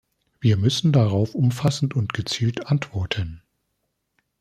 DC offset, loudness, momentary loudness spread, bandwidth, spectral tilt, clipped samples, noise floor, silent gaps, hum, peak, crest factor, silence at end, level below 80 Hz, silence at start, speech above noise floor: under 0.1%; -22 LUFS; 8 LU; 13.5 kHz; -6 dB/octave; under 0.1%; -75 dBFS; none; none; -6 dBFS; 18 dB; 1.05 s; -52 dBFS; 0.4 s; 54 dB